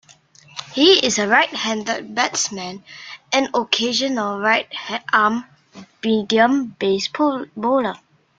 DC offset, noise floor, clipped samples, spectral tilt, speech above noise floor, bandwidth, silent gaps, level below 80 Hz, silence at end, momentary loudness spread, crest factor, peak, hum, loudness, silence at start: under 0.1%; -50 dBFS; under 0.1%; -2.5 dB/octave; 31 dB; 9.4 kHz; none; -64 dBFS; 0.4 s; 14 LU; 20 dB; -2 dBFS; none; -19 LUFS; 0.55 s